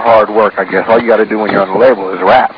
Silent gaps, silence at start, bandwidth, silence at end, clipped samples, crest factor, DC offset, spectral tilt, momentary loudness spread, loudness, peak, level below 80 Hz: none; 0 s; 5.4 kHz; 0 s; 1%; 10 dB; under 0.1%; -8 dB/octave; 4 LU; -10 LUFS; 0 dBFS; -48 dBFS